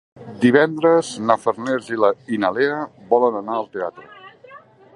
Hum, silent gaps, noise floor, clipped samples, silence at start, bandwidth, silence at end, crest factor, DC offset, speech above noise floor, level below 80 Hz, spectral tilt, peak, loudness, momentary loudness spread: none; none; -45 dBFS; under 0.1%; 0.2 s; 11 kHz; 0.4 s; 20 dB; under 0.1%; 26 dB; -66 dBFS; -5.5 dB/octave; 0 dBFS; -19 LUFS; 12 LU